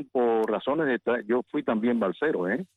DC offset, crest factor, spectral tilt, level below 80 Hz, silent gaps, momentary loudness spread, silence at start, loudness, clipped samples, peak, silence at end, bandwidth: under 0.1%; 12 dB; -8 dB/octave; -68 dBFS; none; 3 LU; 0 s; -26 LUFS; under 0.1%; -14 dBFS; 0.15 s; 4.3 kHz